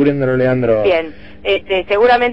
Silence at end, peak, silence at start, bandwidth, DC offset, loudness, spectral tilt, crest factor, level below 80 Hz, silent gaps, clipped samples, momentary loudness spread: 0 s; -2 dBFS; 0 s; 5.8 kHz; 1%; -15 LUFS; -8 dB/octave; 12 dB; -42 dBFS; none; under 0.1%; 7 LU